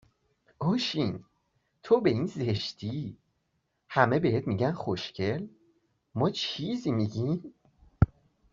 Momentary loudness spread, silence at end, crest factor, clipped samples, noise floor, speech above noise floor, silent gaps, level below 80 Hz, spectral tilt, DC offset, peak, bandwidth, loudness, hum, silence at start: 11 LU; 0.5 s; 24 dB; under 0.1%; -77 dBFS; 48 dB; none; -50 dBFS; -5.5 dB/octave; under 0.1%; -6 dBFS; 7.6 kHz; -29 LUFS; none; 0.6 s